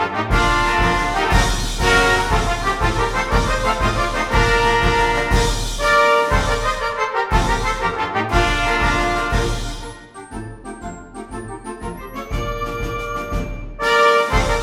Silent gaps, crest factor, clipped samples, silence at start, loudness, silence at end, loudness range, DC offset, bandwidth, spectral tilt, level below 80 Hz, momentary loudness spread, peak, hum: none; 16 dB; under 0.1%; 0 s; -18 LUFS; 0 s; 11 LU; under 0.1%; 15.5 kHz; -4 dB/octave; -24 dBFS; 17 LU; -2 dBFS; none